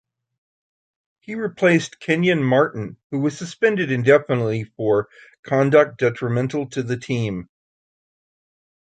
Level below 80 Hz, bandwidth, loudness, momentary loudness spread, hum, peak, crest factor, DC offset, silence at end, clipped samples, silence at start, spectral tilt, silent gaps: -60 dBFS; 9.2 kHz; -20 LUFS; 12 LU; none; -2 dBFS; 20 dB; under 0.1%; 1.4 s; under 0.1%; 1.3 s; -6.5 dB/octave; 3.04-3.10 s, 5.39-5.43 s